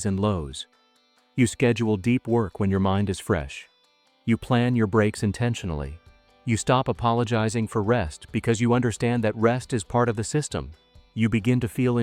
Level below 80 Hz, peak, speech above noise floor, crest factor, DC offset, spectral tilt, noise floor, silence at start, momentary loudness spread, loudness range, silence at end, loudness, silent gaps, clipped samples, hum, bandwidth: -48 dBFS; -8 dBFS; 40 dB; 18 dB; under 0.1%; -6 dB/octave; -63 dBFS; 0 s; 12 LU; 2 LU; 0 s; -24 LUFS; none; under 0.1%; none; 14 kHz